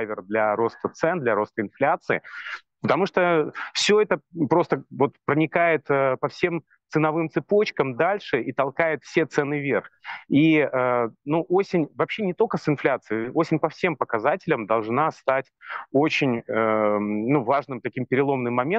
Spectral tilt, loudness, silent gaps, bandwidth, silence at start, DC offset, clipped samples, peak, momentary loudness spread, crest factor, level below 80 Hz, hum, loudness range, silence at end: -6 dB/octave; -23 LUFS; none; 8.6 kHz; 0 s; under 0.1%; under 0.1%; -4 dBFS; 6 LU; 20 dB; -68 dBFS; none; 2 LU; 0 s